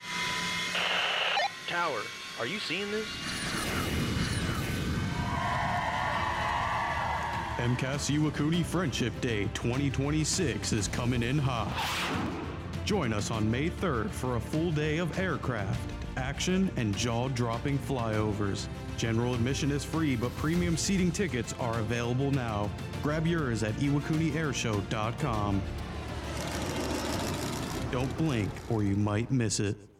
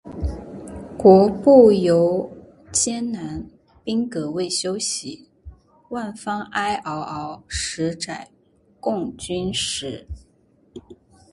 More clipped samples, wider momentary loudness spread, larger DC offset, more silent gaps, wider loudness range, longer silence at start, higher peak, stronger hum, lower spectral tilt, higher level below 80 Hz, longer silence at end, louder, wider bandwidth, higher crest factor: neither; second, 5 LU vs 22 LU; neither; neither; second, 2 LU vs 11 LU; about the same, 0 s vs 0.05 s; second, -18 dBFS vs 0 dBFS; neither; about the same, -5 dB/octave vs -4.5 dB/octave; about the same, -46 dBFS vs -42 dBFS; second, 0.1 s vs 0.4 s; second, -31 LUFS vs -20 LUFS; first, 16.5 kHz vs 11.5 kHz; second, 12 dB vs 22 dB